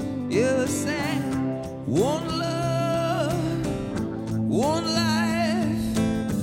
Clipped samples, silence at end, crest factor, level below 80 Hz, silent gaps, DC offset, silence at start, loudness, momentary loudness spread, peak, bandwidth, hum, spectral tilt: under 0.1%; 0 s; 14 dB; -46 dBFS; none; under 0.1%; 0 s; -25 LUFS; 6 LU; -10 dBFS; 16.5 kHz; none; -5.5 dB/octave